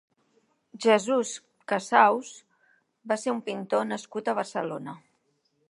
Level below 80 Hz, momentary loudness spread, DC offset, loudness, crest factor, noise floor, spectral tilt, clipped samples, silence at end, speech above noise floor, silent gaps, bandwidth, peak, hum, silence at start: -84 dBFS; 18 LU; under 0.1%; -26 LUFS; 24 dB; -72 dBFS; -4 dB/octave; under 0.1%; 0.75 s; 46 dB; none; 11.5 kHz; -4 dBFS; none; 0.75 s